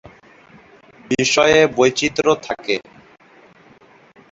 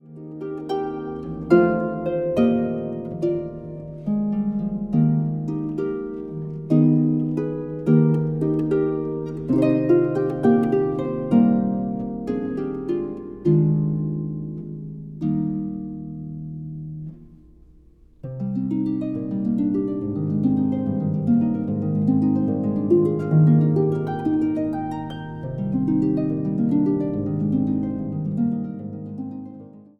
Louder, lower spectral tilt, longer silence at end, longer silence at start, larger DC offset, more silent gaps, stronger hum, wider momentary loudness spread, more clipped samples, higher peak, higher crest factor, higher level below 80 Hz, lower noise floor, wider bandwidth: first, -16 LUFS vs -22 LUFS; second, -3.5 dB/octave vs -11 dB/octave; first, 1.5 s vs 0.2 s; first, 1.1 s vs 0.05 s; neither; neither; neither; second, 11 LU vs 15 LU; neither; about the same, -2 dBFS vs -4 dBFS; about the same, 18 dB vs 18 dB; about the same, -52 dBFS vs -50 dBFS; about the same, -49 dBFS vs -50 dBFS; first, 8 kHz vs 4.5 kHz